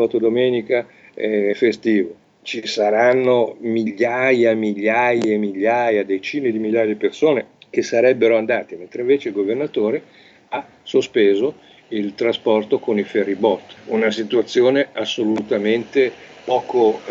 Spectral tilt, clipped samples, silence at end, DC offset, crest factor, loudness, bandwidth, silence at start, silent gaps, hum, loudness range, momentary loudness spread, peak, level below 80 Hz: -5.5 dB/octave; under 0.1%; 0 s; under 0.1%; 16 dB; -19 LUFS; 7.8 kHz; 0 s; none; none; 3 LU; 10 LU; -2 dBFS; -68 dBFS